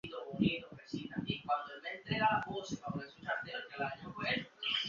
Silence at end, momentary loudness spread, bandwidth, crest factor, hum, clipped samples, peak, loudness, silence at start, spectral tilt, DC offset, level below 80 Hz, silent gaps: 0 s; 11 LU; 7.4 kHz; 20 dB; none; under 0.1%; -18 dBFS; -38 LUFS; 0.05 s; -2.5 dB/octave; under 0.1%; -66 dBFS; none